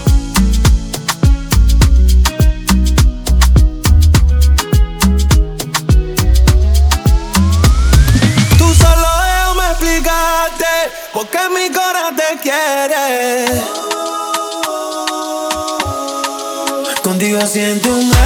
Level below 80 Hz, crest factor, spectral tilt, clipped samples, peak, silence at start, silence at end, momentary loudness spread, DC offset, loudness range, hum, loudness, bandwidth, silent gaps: -14 dBFS; 12 dB; -4.5 dB/octave; under 0.1%; 0 dBFS; 0 s; 0 s; 8 LU; under 0.1%; 6 LU; none; -13 LUFS; over 20 kHz; none